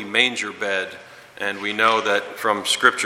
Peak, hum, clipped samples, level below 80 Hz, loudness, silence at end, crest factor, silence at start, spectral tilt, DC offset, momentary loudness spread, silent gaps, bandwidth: 0 dBFS; none; under 0.1%; -70 dBFS; -20 LUFS; 0 s; 22 dB; 0 s; -1.5 dB/octave; under 0.1%; 11 LU; none; 17 kHz